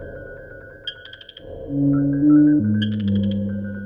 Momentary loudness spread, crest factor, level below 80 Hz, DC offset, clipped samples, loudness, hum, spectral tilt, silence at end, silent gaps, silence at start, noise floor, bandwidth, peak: 24 LU; 14 dB; -46 dBFS; under 0.1%; under 0.1%; -19 LUFS; none; -10 dB/octave; 0 s; none; 0 s; -41 dBFS; 5 kHz; -6 dBFS